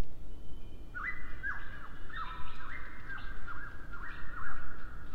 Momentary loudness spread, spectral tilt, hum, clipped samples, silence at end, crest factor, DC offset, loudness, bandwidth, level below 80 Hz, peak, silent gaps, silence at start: 10 LU; -5.5 dB/octave; none; under 0.1%; 0 s; 12 dB; under 0.1%; -44 LUFS; 4.7 kHz; -44 dBFS; -18 dBFS; none; 0 s